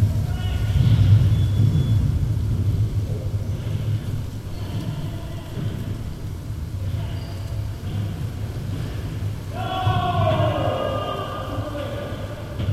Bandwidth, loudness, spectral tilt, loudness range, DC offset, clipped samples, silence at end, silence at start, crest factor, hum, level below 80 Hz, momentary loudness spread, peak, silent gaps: 14 kHz; -24 LUFS; -7.5 dB/octave; 9 LU; under 0.1%; under 0.1%; 0 s; 0 s; 18 dB; none; -32 dBFS; 12 LU; -4 dBFS; none